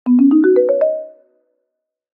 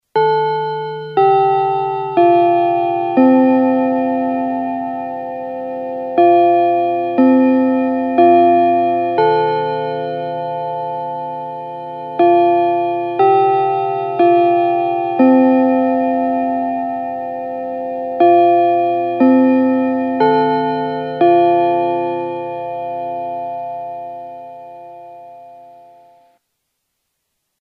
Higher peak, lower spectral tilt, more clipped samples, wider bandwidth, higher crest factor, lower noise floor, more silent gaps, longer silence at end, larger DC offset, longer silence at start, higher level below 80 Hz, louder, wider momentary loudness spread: second, -4 dBFS vs 0 dBFS; first, -10.5 dB/octave vs -9 dB/octave; neither; second, 3 kHz vs 5 kHz; about the same, 12 dB vs 14 dB; first, -77 dBFS vs -72 dBFS; neither; second, 1.05 s vs 1.95 s; neither; about the same, 0.05 s vs 0.15 s; about the same, -72 dBFS vs -72 dBFS; about the same, -13 LUFS vs -15 LUFS; second, 9 LU vs 13 LU